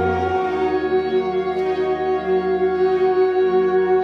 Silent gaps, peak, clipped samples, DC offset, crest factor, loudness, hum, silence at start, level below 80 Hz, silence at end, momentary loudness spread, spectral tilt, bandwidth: none; -8 dBFS; under 0.1%; under 0.1%; 12 dB; -19 LUFS; none; 0 s; -46 dBFS; 0 s; 4 LU; -8 dB/octave; 6 kHz